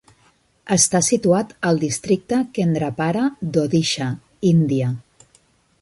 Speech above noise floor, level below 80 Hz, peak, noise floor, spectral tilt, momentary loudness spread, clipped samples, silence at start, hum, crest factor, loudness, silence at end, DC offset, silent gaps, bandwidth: 40 dB; -56 dBFS; -2 dBFS; -59 dBFS; -5 dB/octave; 6 LU; under 0.1%; 0.65 s; none; 18 dB; -19 LUFS; 0.8 s; under 0.1%; none; 11.5 kHz